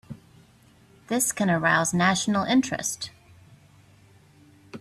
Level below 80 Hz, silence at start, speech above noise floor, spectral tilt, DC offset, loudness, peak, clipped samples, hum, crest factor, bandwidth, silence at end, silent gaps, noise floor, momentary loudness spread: -62 dBFS; 0.1 s; 33 dB; -3.5 dB/octave; under 0.1%; -23 LUFS; -8 dBFS; under 0.1%; none; 20 dB; 15.5 kHz; 0 s; none; -56 dBFS; 20 LU